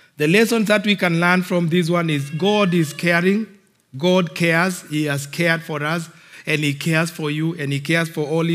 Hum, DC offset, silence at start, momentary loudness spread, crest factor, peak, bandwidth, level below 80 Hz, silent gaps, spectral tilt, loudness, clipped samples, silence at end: none; under 0.1%; 0.2 s; 7 LU; 18 dB; 0 dBFS; 16 kHz; -78 dBFS; none; -5.5 dB/octave; -19 LUFS; under 0.1%; 0 s